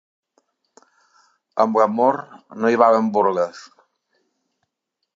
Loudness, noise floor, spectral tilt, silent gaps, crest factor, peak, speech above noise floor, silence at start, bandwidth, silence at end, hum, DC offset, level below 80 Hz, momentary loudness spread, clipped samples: -19 LUFS; -78 dBFS; -6.5 dB/octave; none; 22 dB; 0 dBFS; 60 dB; 1.55 s; 7.6 kHz; 1.55 s; none; under 0.1%; -76 dBFS; 13 LU; under 0.1%